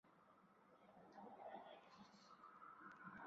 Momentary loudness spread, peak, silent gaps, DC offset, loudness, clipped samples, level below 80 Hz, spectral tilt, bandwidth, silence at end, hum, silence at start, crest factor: 8 LU; -42 dBFS; none; under 0.1%; -62 LUFS; under 0.1%; under -90 dBFS; -3.5 dB/octave; 7.4 kHz; 0 s; none; 0.05 s; 20 dB